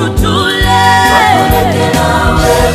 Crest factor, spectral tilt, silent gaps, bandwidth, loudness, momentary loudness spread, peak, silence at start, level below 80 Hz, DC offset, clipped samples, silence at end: 8 dB; -4.5 dB/octave; none; 16 kHz; -8 LUFS; 4 LU; 0 dBFS; 0 s; -18 dBFS; under 0.1%; 0.5%; 0 s